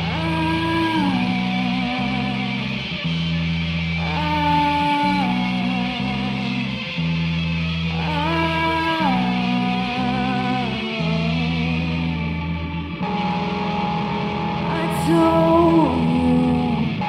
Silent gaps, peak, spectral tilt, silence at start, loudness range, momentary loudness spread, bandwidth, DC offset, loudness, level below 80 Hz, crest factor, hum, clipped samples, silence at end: none; -4 dBFS; -7 dB/octave; 0 s; 4 LU; 6 LU; 13.5 kHz; under 0.1%; -21 LUFS; -38 dBFS; 16 dB; none; under 0.1%; 0 s